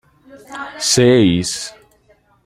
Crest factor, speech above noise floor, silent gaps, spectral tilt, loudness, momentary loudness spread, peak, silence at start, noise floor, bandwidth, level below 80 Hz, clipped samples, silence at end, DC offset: 16 dB; 40 dB; none; -4 dB/octave; -14 LUFS; 19 LU; -2 dBFS; 0.35 s; -55 dBFS; 15 kHz; -50 dBFS; under 0.1%; 0.75 s; under 0.1%